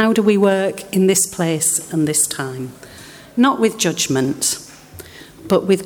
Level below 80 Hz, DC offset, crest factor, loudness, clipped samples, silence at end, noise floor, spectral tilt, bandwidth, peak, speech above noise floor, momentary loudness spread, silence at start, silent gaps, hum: -56 dBFS; under 0.1%; 16 dB; -17 LUFS; under 0.1%; 0 s; -39 dBFS; -4 dB/octave; 20 kHz; -2 dBFS; 22 dB; 23 LU; 0 s; none; none